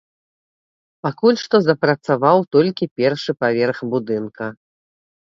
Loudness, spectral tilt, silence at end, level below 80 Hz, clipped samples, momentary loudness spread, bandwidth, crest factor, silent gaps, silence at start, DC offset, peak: -18 LUFS; -6.5 dB/octave; 0.75 s; -64 dBFS; under 0.1%; 12 LU; 7.6 kHz; 18 dB; 2.91-2.96 s; 1.05 s; under 0.1%; 0 dBFS